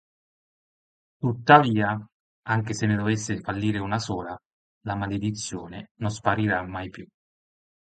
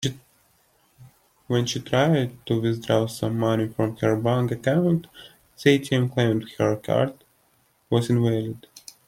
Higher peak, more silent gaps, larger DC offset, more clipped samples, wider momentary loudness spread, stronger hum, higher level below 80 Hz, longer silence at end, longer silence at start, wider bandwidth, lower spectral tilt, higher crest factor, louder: about the same, -2 dBFS vs -4 dBFS; first, 2.12-2.42 s, 4.46-4.81 s, 5.91-5.95 s vs none; neither; neither; first, 21 LU vs 7 LU; neither; about the same, -54 dBFS vs -58 dBFS; first, 0.8 s vs 0.3 s; first, 1.2 s vs 0 s; second, 9.2 kHz vs 16 kHz; about the same, -5.5 dB/octave vs -6.5 dB/octave; about the same, 24 dB vs 20 dB; about the same, -25 LUFS vs -23 LUFS